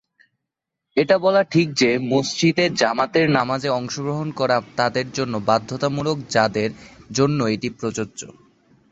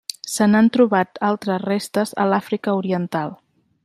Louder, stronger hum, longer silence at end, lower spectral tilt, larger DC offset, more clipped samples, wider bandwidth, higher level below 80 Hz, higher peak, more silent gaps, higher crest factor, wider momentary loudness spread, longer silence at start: about the same, -20 LUFS vs -20 LUFS; neither; about the same, 0.6 s vs 0.5 s; about the same, -5 dB/octave vs -5.5 dB/octave; neither; neither; second, 8.2 kHz vs 14 kHz; first, -58 dBFS vs -64 dBFS; about the same, -2 dBFS vs -4 dBFS; neither; about the same, 18 dB vs 16 dB; about the same, 9 LU vs 10 LU; first, 0.95 s vs 0.25 s